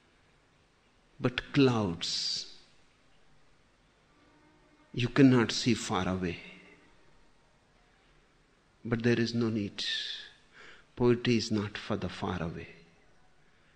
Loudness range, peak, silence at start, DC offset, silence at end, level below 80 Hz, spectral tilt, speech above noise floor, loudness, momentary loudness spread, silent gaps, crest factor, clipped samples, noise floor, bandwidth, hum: 7 LU; -10 dBFS; 1.2 s; under 0.1%; 1.05 s; -60 dBFS; -5.5 dB/octave; 37 dB; -30 LUFS; 18 LU; none; 22 dB; under 0.1%; -66 dBFS; 9.6 kHz; none